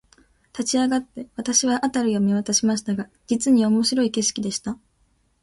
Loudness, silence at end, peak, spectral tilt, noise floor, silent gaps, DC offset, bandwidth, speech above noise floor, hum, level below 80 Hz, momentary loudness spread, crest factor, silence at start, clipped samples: -21 LUFS; 0.7 s; -6 dBFS; -3.5 dB/octave; -64 dBFS; none; under 0.1%; 11.5 kHz; 43 dB; none; -60 dBFS; 11 LU; 16 dB; 0.55 s; under 0.1%